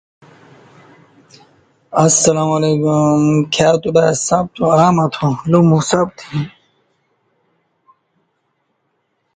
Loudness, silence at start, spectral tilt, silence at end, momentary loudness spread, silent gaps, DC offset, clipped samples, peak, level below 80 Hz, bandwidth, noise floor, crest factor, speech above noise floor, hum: -14 LUFS; 1.9 s; -5 dB/octave; 2.9 s; 9 LU; none; under 0.1%; under 0.1%; 0 dBFS; -52 dBFS; 9.6 kHz; -67 dBFS; 16 dB; 53 dB; none